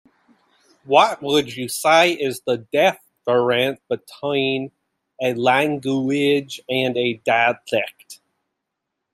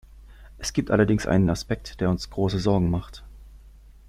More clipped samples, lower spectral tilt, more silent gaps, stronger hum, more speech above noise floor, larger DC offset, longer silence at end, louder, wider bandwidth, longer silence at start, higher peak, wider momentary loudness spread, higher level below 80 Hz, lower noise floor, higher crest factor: neither; second, -4 dB/octave vs -6.5 dB/octave; neither; neither; first, 60 dB vs 25 dB; neither; first, 1 s vs 0.4 s; first, -20 LUFS vs -24 LUFS; about the same, 15.5 kHz vs 14.5 kHz; first, 0.85 s vs 0.15 s; first, -2 dBFS vs -6 dBFS; about the same, 10 LU vs 11 LU; second, -68 dBFS vs -42 dBFS; first, -80 dBFS vs -48 dBFS; about the same, 20 dB vs 20 dB